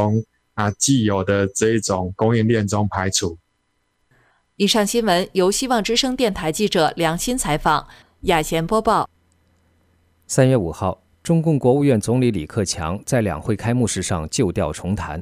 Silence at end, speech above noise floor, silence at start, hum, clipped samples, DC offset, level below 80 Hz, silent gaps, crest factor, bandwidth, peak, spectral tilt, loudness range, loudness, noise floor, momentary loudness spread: 0 s; 49 dB; 0 s; none; under 0.1%; under 0.1%; -42 dBFS; none; 18 dB; 15.5 kHz; -2 dBFS; -5 dB/octave; 2 LU; -20 LUFS; -68 dBFS; 7 LU